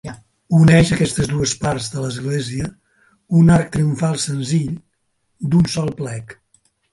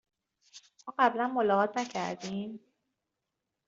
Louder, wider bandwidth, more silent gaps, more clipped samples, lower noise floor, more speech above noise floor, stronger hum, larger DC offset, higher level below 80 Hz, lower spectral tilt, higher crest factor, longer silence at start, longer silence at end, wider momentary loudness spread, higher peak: first, -17 LUFS vs -30 LUFS; first, 11.5 kHz vs 7.8 kHz; neither; neither; second, -68 dBFS vs -86 dBFS; second, 51 dB vs 56 dB; neither; neither; first, -42 dBFS vs -78 dBFS; about the same, -6 dB/octave vs -5 dB/octave; about the same, 18 dB vs 22 dB; second, 0.05 s vs 0.55 s; second, 0.6 s vs 1.1 s; about the same, 15 LU vs 16 LU; first, 0 dBFS vs -12 dBFS